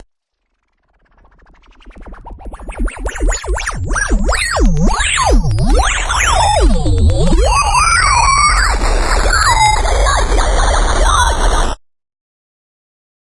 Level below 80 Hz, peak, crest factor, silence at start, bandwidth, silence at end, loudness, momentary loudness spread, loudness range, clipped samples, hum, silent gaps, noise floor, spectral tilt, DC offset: -16 dBFS; 0 dBFS; 12 dB; 1.85 s; 11.5 kHz; 1.6 s; -13 LUFS; 12 LU; 11 LU; under 0.1%; none; none; -68 dBFS; -3.5 dB/octave; under 0.1%